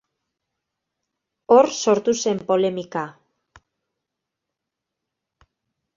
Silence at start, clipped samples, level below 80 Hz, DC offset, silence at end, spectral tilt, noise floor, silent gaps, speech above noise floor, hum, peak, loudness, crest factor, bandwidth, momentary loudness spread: 1.5 s; under 0.1%; -68 dBFS; under 0.1%; 2.85 s; -4.5 dB/octave; -84 dBFS; none; 64 dB; none; -2 dBFS; -20 LUFS; 22 dB; 7.6 kHz; 14 LU